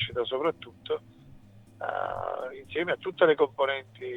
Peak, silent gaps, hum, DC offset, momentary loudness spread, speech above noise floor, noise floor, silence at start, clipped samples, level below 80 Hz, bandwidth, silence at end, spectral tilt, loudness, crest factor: -10 dBFS; none; none; under 0.1%; 12 LU; 23 dB; -52 dBFS; 0 s; under 0.1%; -64 dBFS; 4.5 kHz; 0 s; -6.5 dB/octave; -29 LUFS; 20 dB